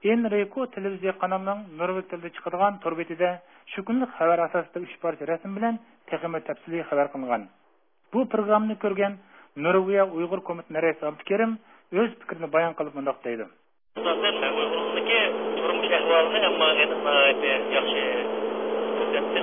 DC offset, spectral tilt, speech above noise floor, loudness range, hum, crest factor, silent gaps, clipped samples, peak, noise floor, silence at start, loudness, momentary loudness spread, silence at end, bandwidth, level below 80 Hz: under 0.1%; -8 dB/octave; 41 dB; 7 LU; none; 18 dB; none; under 0.1%; -8 dBFS; -66 dBFS; 0 s; -25 LUFS; 12 LU; 0 s; 3.7 kHz; -78 dBFS